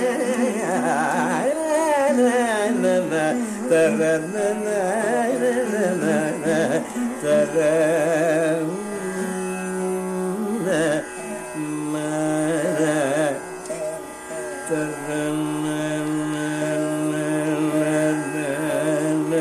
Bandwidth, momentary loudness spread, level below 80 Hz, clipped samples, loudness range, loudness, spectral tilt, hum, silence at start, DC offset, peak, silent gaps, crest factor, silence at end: 14 kHz; 8 LU; -60 dBFS; under 0.1%; 5 LU; -22 LUFS; -5 dB/octave; none; 0 s; under 0.1%; -8 dBFS; none; 14 dB; 0 s